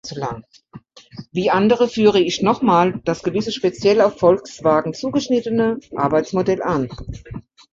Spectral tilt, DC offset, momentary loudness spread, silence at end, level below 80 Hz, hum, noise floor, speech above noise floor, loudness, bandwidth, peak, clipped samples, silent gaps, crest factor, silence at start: -6 dB/octave; under 0.1%; 14 LU; 0.3 s; -46 dBFS; none; -39 dBFS; 21 dB; -18 LUFS; 7.8 kHz; -2 dBFS; under 0.1%; none; 16 dB; 0.05 s